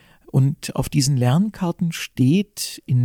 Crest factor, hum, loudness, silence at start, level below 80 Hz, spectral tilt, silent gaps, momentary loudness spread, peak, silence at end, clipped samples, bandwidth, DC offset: 14 dB; none; -21 LUFS; 0.35 s; -46 dBFS; -6 dB/octave; none; 7 LU; -6 dBFS; 0 s; under 0.1%; 18 kHz; under 0.1%